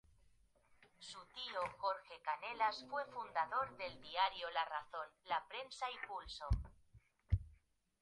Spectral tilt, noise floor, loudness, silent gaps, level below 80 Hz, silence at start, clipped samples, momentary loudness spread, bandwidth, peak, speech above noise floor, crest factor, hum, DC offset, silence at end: -4.5 dB/octave; -73 dBFS; -43 LUFS; none; -52 dBFS; 0.8 s; under 0.1%; 11 LU; 11 kHz; -22 dBFS; 30 dB; 22 dB; none; under 0.1%; 0.45 s